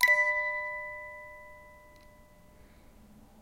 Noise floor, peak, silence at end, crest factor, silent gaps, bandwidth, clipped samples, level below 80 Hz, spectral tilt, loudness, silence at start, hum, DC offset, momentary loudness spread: -57 dBFS; -10 dBFS; 1.65 s; 24 dB; none; 16 kHz; under 0.1%; -62 dBFS; -1 dB/octave; -29 LUFS; 0 s; none; under 0.1%; 26 LU